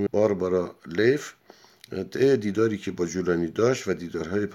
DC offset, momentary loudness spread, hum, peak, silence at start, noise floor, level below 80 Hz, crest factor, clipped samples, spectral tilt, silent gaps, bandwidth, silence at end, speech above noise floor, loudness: under 0.1%; 9 LU; none; -8 dBFS; 0 s; -52 dBFS; -60 dBFS; 18 dB; under 0.1%; -6 dB/octave; none; 13.5 kHz; 0 s; 28 dB; -25 LUFS